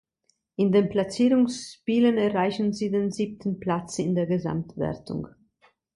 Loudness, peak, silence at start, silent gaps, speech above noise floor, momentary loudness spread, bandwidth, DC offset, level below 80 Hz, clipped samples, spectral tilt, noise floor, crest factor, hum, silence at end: -25 LUFS; -10 dBFS; 0.6 s; none; 48 dB; 12 LU; 11.5 kHz; under 0.1%; -58 dBFS; under 0.1%; -6.5 dB/octave; -72 dBFS; 16 dB; none; 0.65 s